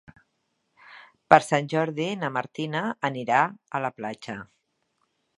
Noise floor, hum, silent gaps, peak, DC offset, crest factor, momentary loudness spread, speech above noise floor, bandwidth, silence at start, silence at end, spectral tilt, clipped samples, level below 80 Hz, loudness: -75 dBFS; none; none; 0 dBFS; under 0.1%; 26 dB; 16 LU; 50 dB; 11.5 kHz; 0.9 s; 0.95 s; -5.5 dB/octave; under 0.1%; -70 dBFS; -25 LUFS